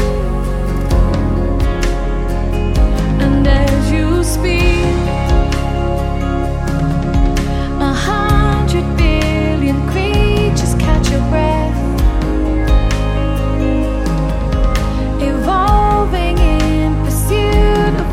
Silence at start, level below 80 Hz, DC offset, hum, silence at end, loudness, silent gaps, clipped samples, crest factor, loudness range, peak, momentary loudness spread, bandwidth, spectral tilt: 0 s; -16 dBFS; under 0.1%; none; 0 s; -15 LUFS; none; under 0.1%; 12 dB; 2 LU; 0 dBFS; 5 LU; 14.5 kHz; -6.5 dB/octave